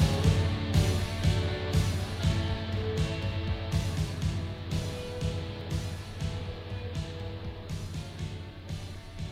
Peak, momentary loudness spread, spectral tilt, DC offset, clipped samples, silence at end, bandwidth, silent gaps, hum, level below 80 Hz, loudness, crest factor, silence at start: -12 dBFS; 12 LU; -6 dB/octave; under 0.1%; under 0.1%; 0 s; 14.5 kHz; none; none; -38 dBFS; -32 LUFS; 20 dB; 0 s